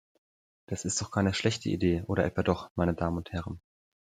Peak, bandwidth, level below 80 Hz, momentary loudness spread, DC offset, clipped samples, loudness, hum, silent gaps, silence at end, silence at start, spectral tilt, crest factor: -10 dBFS; 11.5 kHz; -54 dBFS; 10 LU; under 0.1%; under 0.1%; -30 LUFS; none; 2.71-2.75 s; 0.55 s; 0.7 s; -5 dB/octave; 22 dB